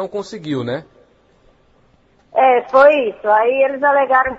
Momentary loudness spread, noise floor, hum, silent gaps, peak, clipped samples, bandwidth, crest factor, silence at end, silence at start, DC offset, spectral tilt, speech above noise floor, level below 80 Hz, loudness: 15 LU; -54 dBFS; none; none; 0 dBFS; under 0.1%; 8 kHz; 16 dB; 0 s; 0 s; under 0.1%; -6 dB/octave; 40 dB; -54 dBFS; -15 LUFS